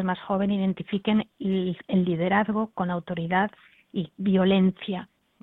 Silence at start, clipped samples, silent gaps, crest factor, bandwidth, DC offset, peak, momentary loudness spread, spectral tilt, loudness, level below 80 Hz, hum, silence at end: 0 s; under 0.1%; none; 18 dB; 4 kHz; under 0.1%; -8 dBFS; 11 LU; -10 dB/octave; -26 LUFS; -58 dBFS; none; 0.4 s